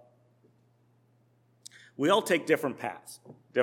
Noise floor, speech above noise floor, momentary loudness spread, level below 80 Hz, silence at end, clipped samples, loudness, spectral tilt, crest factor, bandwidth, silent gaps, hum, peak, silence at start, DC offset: -66 dBFS; 38 dB; 25 LU; -88 dBFS; 0 s; under 0.1%; -28 LUFS; -4 dB/octave; 22 dB; 17.5 kHz; none; none; -10 dBFS; 2 s; under 0.1%